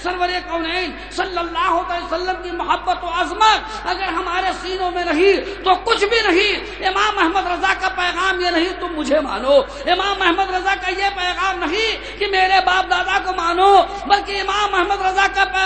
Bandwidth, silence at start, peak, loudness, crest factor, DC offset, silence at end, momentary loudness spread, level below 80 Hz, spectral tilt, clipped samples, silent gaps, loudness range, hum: 9 kHz; 0 s; 0 dBFS; -18 LUFS; 18 dB; 0.3%; 0 s; 8 LU; -40 dBFS; -3 dB/octave; under 0.1%; none; 3 LU; 50 Hz at -40 dBFS